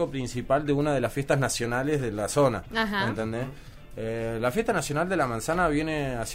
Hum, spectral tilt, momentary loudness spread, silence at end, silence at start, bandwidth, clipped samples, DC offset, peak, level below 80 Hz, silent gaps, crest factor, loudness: none; -5 dB/octave; 8 LU; 0 s; 0 s; 16 kHz; under 0.1%; under 0.1%; -10 dBFS; -44 dBFS; none; 16 dB; -27 LUFS